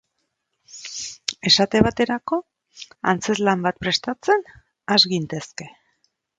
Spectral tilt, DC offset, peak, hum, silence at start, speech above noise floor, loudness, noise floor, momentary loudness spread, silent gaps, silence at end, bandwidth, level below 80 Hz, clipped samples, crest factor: -3.5 dB/octave; under 0.1%; 0 dBFS; none; 0.75 s; 54 dB; -20 LUFS; -75 dBFS; 21 LU; none; 0.7 s; 9.4 kHz; -50 dBFS; under 0.1%; 22 dB